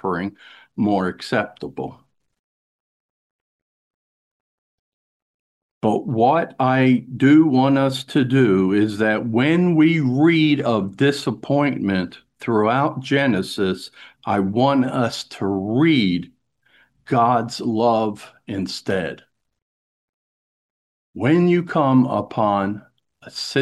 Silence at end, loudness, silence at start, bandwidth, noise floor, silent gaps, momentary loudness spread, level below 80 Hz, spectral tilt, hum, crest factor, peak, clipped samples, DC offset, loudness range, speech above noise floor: 0 s; -19 LUFS; 0.05 s; 12.5 kHz; -59 dBFS; 2.39-5.81 s, 19.62-21.13 s; 13 LU; -62 dBFS; -7 dB/octave; none; 16 dB; -4 dBFS; under 0.1%; under 0.1%; 10 LU; 41 dB